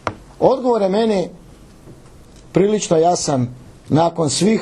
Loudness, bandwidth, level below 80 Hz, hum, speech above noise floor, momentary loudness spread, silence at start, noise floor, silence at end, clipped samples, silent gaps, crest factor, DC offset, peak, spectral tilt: -17 LUFS; 12 kHz; -48 dBFS; none; 27 dB; 7 LU; 0.05 s; -42 dBFS; 0 s; under 0.1%; none; 18 dB; under 0.1%; 0 dBFS; -5.5 dB/octave